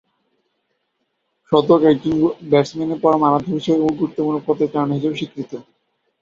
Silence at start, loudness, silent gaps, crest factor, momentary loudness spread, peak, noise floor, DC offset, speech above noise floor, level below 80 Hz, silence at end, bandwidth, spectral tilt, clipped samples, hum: 1.5 s; -18 LUFS; none; 16 dB; 12 LU; -2 dBFS; -71 dBFS; under 0.1%; 54 dB; -56 dBFS; 0.6 s; 7.4 kHz; -7.5 dB/octave; under 0.1%; none